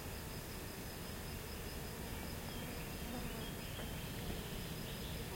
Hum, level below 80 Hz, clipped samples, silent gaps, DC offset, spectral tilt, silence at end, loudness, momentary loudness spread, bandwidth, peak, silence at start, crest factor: none; -52 dBFS; under 0.1%; none; under 0.1%; -4 dB/octave; 0 s; -45 LUFS; 2 LU; 16.5 kHz; -30 dBFS; 0 s; 14 dB